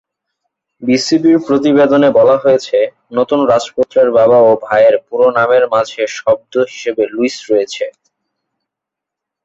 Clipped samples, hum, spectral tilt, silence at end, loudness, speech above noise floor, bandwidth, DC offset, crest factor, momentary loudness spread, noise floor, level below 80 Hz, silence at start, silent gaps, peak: under 0.1%; none; -5 dB/octave; 1.55 s; -12 LUFS; 71 dB; 8 kHz; under 0.1%; 12 dB; 9 LU; -82 dBFS; -56 dBFS; 0.8 s; none; -2 dBFS